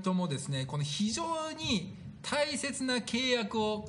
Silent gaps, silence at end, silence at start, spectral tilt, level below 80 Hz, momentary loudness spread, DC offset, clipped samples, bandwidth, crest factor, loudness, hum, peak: none; 0 s; 0 s; -4 dB/octave; -62 dBFS; 5 LU; under 0.1%; under 0.1%; 10.5 kHz; 16 dB; -32 LUFS; none; -18 dBFS